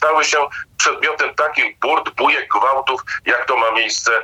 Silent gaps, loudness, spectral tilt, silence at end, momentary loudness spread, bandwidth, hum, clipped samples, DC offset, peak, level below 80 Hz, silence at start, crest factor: none; -16 LUFS; 0 dB/octave; 0 s; 4 LU; 16 kHz; none; under 0.1%; under 0.1%; -2 dBFS; -60 dBFS; 0 s; 14 dB